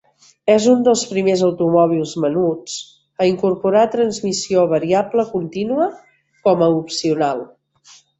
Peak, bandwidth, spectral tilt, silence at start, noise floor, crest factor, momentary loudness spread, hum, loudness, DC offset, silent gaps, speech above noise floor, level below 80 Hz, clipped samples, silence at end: -2 dBFS; 8.2 kHz; -5.5 dB/octave; 0.45 s; -49 dBFS; 16 dB; 8 LU; none; -17 LUFS; under 0.1%; none; 33 dB; -60 dBFS; under 0.1%; 0.75 s